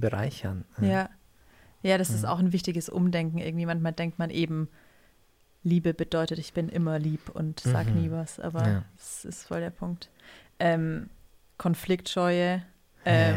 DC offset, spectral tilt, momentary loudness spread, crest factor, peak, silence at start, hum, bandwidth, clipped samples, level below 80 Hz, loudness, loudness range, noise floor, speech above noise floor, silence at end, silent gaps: under 0.1%; -6.5 dB/octave; 11 LU; 18 dB; -10 dBFS; 0 s; none; 16 kHz; under 0.1%; -56 dBFS; -29 LUFS; 3 LU; -63 dBFS; 35 dB; 0 s; none